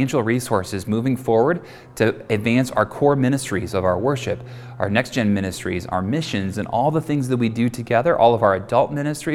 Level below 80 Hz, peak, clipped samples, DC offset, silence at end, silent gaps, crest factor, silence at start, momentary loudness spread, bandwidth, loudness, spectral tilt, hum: -50 dBFS; -2 dBFS; under 0.1%; under 0.1%; 0 s; none; 18 dB; 0 s; 7 LU; 16.5 kHz; -20 LUFS; -6 dB/octave; none